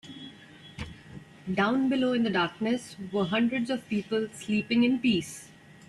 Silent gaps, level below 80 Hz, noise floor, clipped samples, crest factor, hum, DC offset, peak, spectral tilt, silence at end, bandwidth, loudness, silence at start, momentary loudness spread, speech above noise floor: none; -60 dBFS; -50 dBFS; under 0.1%; 16 dB; none; under 0.1%; -14 dBFS; -5.5 dB/octave; 0.35 s; 12 kHz; -28 LUFS; 0.05 s; 20 LU; 23 dB